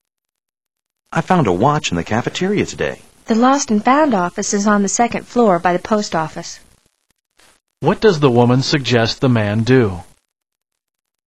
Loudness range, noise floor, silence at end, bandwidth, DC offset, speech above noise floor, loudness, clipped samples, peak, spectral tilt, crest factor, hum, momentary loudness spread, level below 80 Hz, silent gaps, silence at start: 3 LU; -79 dBFS; 1.25 s; 12 kHz; 0.9%; 64 dB; -16 LUFS; under 0.1%; 0 dBFS; -5 dB/octave; 16 dB; none; 10 LU; -48 dBFS; none; 1.1 s